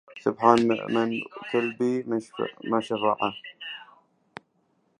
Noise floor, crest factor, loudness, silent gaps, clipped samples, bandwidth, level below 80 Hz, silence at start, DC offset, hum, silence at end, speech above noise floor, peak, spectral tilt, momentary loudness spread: -69 dBFS; 24 dB; -26 LUFS; none; under 0.1%; 11 kHz; -70 dBFS; 0.1 s; under 0.1%; none; 1.15 s; 44 dB; -4 dBFS; -6 dB/octave; 21 LU